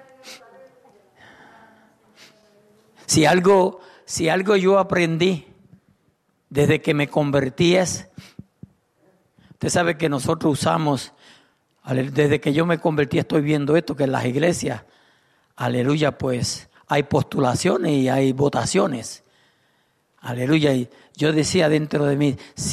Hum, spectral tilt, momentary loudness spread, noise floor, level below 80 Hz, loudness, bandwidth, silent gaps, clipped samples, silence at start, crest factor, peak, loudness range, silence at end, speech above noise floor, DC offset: none; -5.5 dB/octave; 12 LU; -66 dBFS; -54 dBFS; -20 LUFS; 13.5 kHz; none; under 0.1%; 0.25 s; 16 dB; -6 dBFS; 4 LU; 0 s; 46 dB; under 0.1%